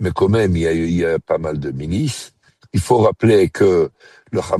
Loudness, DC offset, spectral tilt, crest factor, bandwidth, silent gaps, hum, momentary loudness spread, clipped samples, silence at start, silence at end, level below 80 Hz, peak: -17 LUFS; under 0.1%; -6.5 dB/octave; 16 dB; 12.5 kHz; none; none; 11 LU; under 0.1%; 0 s; 0 s; -40 dBFS; -2 dBFS